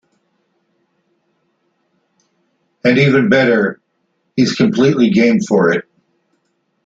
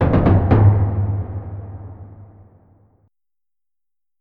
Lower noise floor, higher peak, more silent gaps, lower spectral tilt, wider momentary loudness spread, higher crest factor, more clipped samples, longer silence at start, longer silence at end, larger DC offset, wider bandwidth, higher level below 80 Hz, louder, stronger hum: second, -66 dBFS vs under -90 dBFS; about the same, -2 dBFS vs -2 dBFS; neither; second, -6.5 dB/octave vs -12 dB/octave; second, 7 LU vs 23 LU; about the same, 16 dB vs 18 dB; neither; first, 2.85 s vs 0 s; second, 1.05 s vs 1.95 s; neither; first, 7.8 kHz vs 4.1 kHz; second, -56 dBFS vs -32 dBFS; first, -13 LUFS vs -16 LUFS; neither